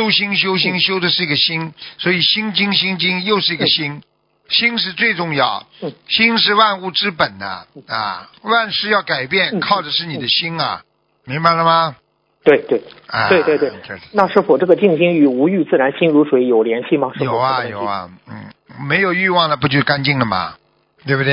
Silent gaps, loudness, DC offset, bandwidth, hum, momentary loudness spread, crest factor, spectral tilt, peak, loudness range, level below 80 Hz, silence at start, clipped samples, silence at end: none; -15 LUFS; under 0.1%; 5.6 kHz; none; 12 LU; 16 dB; -8 dB/octave; 0 dBFS; 3 LU; -56 dBFS; 0 s; under 0.1%; 0 s